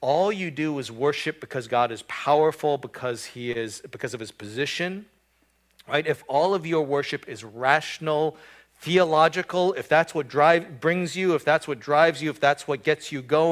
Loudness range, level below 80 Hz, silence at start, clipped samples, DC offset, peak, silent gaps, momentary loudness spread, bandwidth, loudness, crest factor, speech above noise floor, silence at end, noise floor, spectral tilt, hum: 7 LU; -68 dBFS; 0 s; under 0.1%; under 0.1%; -4 dBFS; none; 12 LU; 15.5 kHz; -24 LUFS; 20 dB; 42 dB; 0 s; -66 dBFS; -5 dB/octave; none